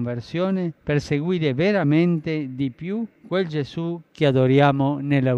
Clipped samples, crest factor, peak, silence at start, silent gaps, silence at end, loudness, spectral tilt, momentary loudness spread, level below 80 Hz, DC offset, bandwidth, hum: under 0.1%; 16 dB; -6 dBFS; 0 s; none; 0 s; -22 LUFS; -8 dB/octave; 11 LU; -54 dBFS; under 0.1%; 8.2 kHz; none